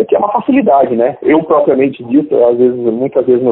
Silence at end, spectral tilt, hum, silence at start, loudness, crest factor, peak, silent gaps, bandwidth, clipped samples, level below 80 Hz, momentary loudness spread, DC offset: 0 s; -12 dB/octave; none; 0 s; -11 LUFS; 10 dB; 0 dBFS; none; 4 kHz; under 0.1%; -54 dBFS; 4 LU; under 0.1%